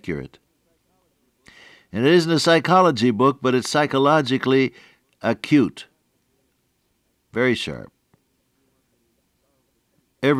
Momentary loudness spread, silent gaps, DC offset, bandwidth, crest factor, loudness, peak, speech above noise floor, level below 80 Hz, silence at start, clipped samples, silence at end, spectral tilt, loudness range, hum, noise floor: 15 LU; none; under 0.1%; 14 kHz; 18 dB; -19 LUFS; -4 dBFS; 50 dB; -60 dBFS; 0.05 s; under 0.1%; 0 s; -5.5 dB/octave; 12 LU; none; -69 dBFS